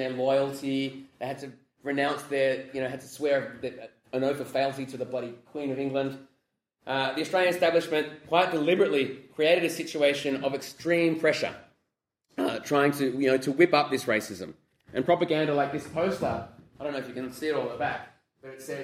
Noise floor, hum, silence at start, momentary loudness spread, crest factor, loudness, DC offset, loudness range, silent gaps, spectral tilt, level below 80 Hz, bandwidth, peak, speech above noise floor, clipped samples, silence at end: -81 dBFS; none; 0 s; 15 LU; 20 dB; -28 LUFS; under 0.1%; 6 LU; none; -5 dB/octave; -68 dBFS; 16 kHz; -8 dBFS; 54 dB; under 0.1%; 0 s